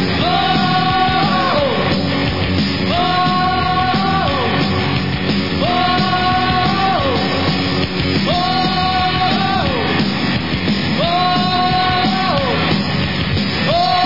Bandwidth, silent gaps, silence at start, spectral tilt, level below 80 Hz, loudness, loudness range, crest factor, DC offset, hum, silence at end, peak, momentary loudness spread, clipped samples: 5.8 kHz; none; 0 s; -6.5 dB/octave; -36 dBFS; -15 LUFS; 1 LU; 12 dB; 2%; none; 0 s; -2 dBFS; 3 LU; under 0.1%